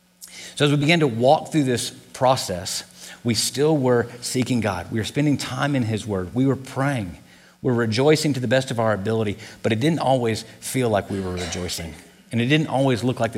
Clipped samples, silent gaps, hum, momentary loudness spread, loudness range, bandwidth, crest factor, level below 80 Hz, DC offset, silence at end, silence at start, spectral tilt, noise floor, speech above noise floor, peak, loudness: under 0.1%; none; none; 11 LU; 3 LU; 16.5 kHz; 18 dB; -54 dBFS; under 0.1%; 0 s; 0.2 s; -5 dB/octave; -41 dBFS; 20 dB; -4 dBFS; -22 LUFS